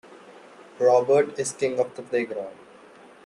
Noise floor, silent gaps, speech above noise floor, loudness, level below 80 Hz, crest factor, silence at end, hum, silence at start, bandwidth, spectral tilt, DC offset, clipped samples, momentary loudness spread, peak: -49 dBFS; none; 26 dB; -24 LUFS; -72 dBFS; 18 dB; 0.7 s; none; 0.1 s; 11.5 kHz; -4.5 dB/octave; under 0.1%; under 0.1%; 13 LU; -8 dBFS